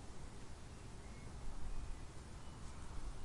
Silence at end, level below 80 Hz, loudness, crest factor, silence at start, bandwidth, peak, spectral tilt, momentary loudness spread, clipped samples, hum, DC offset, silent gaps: 0 s; -50 dBFS; -54 LUFS; 14 dB; 0 s; 11.5 kHz; -32 dBFS; -5 dB/octave; 3 LU; under 0.1%; none; under 0.1%; none